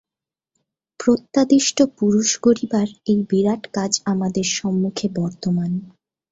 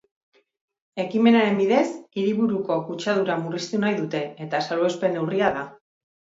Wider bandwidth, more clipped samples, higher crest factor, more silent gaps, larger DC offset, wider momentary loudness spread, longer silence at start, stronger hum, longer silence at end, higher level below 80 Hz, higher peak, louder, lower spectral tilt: about the same, 8 kHz vs 7.8 kHz; neither; about the same, 18 dB vs 20 dB; neither; neither; second, 7 LU vs 10 LU; about the same, 1 s vs 0.95 s; neither; second, 0.45 s vs 0.65 s; first, -58 dBFS vs -68 dBFS; about the same, -2 dBFS vs -4 dBFS; first, -20 LUFS vs -23 LUFS; second, -4.5 dB/octave vs -6 dB/octave